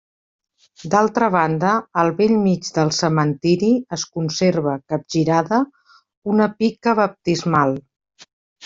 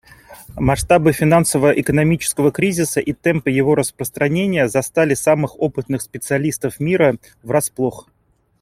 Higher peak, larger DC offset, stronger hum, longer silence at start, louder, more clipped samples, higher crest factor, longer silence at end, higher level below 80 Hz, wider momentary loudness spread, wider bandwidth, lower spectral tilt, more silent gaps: about the same, -2 dBFS vs -2 dBFS; neither; neither; first, 0.8 s vs 0.3 s; about the same, -19 LUFS vs -17 LUFS; neither; about the same, 16 dB vs 16 dB; second, 0 s vs 0.6 s; second, -58 dBFS vs -42 dBFS; about the same, 7 LU vs 8 LU; second, 7.8 kHz vs 16.5 kHz; about the same, -5.5 dB/octave vs -5.5 dB/octave; first, 6.17-6.22 s, 8.33-8.56 s vs none